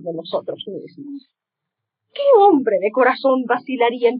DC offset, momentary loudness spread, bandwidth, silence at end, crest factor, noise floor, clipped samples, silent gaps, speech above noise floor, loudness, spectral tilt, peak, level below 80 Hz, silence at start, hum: under 0.1%; 23 LU; 5 kHz; 0 s; 16 dB; -82 dBFS; under 0.1%; none; 64 dB; -17 LUFS; -2.5 dB/octave; -4 dBFS; -88 dBFS; 0 s; none